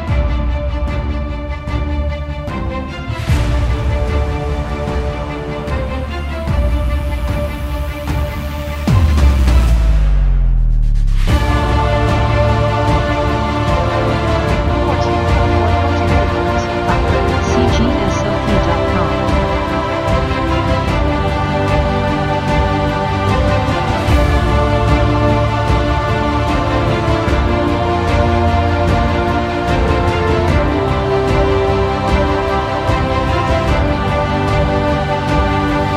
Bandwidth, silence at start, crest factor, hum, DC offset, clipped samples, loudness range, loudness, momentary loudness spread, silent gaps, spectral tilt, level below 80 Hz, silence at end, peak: 13.5 kHz; 0 s; 14 dB; none; under 0.1%; under 0.1%; 5 LU; -15 LUFS; 7 LU; none; -7 dB/octave; -18 dBFS; 0 s; 0 dBFS